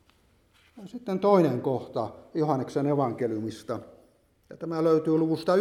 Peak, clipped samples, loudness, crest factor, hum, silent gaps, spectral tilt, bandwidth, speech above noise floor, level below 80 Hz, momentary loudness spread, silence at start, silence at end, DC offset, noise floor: -8 dBFS; under 0.1%; -27 LUFS; 20 dB; none; none; -8 dB/octave; 14 kHz; 37 dB; -68 dBFS; 14 LU; 0.75 s; 0 s; under 0.1%; -63 dBFS